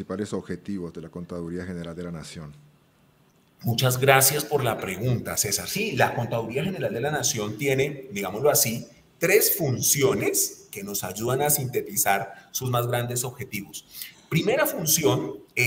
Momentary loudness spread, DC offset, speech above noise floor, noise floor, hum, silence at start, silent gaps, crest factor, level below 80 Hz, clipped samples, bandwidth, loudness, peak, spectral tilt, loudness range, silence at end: 15 LU; under 0.1%; 35 dB; -60 dBFS; none; 0 s; none; 24 dB; -58 dBFS; under 0.1%; 16.5 kHz; -24 LUFS; -2 dBFS; -3.5 dB/octave; 4 LU; 0 s